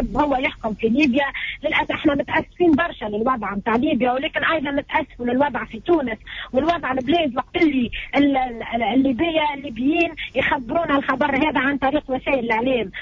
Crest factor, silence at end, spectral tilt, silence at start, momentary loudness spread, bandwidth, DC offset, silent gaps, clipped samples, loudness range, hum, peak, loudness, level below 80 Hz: 14 dB; 0 s; -6.5 dB/octave; 0 s; 5 LU; 7.4 kHz; under 0.1%; none; under 0.1%; 1 LU; none; -6 dBFS; -21 LUFS; -42 dBFS